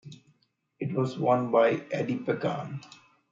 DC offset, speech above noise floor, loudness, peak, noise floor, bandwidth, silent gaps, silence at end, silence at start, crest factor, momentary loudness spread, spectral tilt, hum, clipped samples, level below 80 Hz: under 0.1%; 43 dB; -28 LUFS; -10 dBFS; -70 dBFS; 7.6 kHz; none; 0.35 s; 0.05 s; 20 dB; 13 LU; -7.5 dB/octave; none; under 0.1%; -74 dBFS